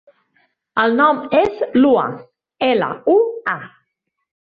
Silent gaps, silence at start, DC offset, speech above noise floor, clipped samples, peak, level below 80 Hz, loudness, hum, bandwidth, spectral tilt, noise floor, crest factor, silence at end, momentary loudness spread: none; 0.75 s; under 0.1%; 58 dB; under 0.1%; -2 dBFS; -58 dBFS; -17 LUFS; none; 5 kHz; -7.5 dB/octave; -74 dBFS; 16 dB; 0.85 s; 10 LU